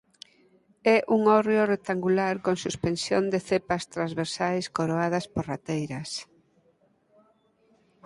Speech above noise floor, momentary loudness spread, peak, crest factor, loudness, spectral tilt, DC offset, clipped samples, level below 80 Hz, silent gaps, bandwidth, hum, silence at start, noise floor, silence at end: 40 dB; 10 LU; -8 dBFS; 20 dB; -26 LUFS; -5.5 dB/octave; under 0.1%; under 0.1%; -58 dBFS; none; 11.5 kHz; none; 0.85 s; -66 dBFS; 1.85 s